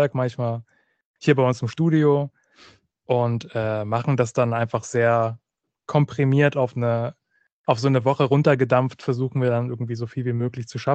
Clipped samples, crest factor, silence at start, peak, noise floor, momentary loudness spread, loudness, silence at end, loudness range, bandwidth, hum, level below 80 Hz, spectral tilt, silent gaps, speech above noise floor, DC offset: under 0.1%; 18 dB; 0 s; -4 dBFS; -53 dBFS; 10 LU; -22 LUFS; 0 s; 2 LU; 8.4 kHz; none; -62 dBFS; -7.5 dB/octave; 1.05-1.14 s, 7.52-7.64 s; 32 dB; under 0.1%